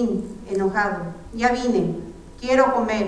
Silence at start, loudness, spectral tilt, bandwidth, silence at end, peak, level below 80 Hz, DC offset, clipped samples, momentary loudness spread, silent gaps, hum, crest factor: 0 s; -22 LUFS; -6 dB/octave; 11 kHz; 0 s; -4 dBFS; -44 dBFS; under 0.1%; under 0.1%; 15 LU; none; none; 18 dB